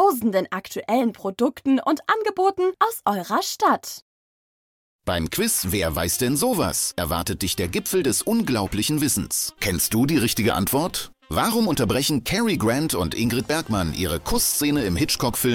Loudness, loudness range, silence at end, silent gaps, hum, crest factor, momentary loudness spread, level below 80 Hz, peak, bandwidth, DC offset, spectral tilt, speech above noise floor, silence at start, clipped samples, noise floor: -22 LUFS; 2 LU; 0 s; 4.02-4.99 s; none; 16 dB; 5 LU; -44 dBFS; -6 dBFS; 19 kHz; under 0.1%; -4 dB/octave; over 68 dB; 0 s; under 0.1%; under -90 dBFS